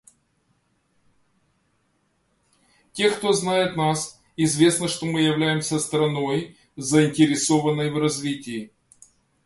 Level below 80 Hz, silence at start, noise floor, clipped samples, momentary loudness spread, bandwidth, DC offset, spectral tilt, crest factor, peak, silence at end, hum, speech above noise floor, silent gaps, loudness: -62 dBFS; 2.95 s; -68 dBFS; under 0.1%; 13 LU; 11.5 kHz; under 0.1%; -4.5 dB/octave; 20 dB; -4 dBFS; 0.8 s; none; 47 dB; none; -22 LUFS